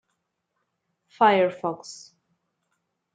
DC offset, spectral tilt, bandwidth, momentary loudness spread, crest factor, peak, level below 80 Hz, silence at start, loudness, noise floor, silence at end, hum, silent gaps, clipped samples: under 0.1%; -5 dB/octave; 9.2 kHz; 22 LU; 22 dB; -6 dBFS; -80 dBFS; 1.2 s; -22 LUFS; -78 dBFS; 1.2 s; none; none; under 0.1%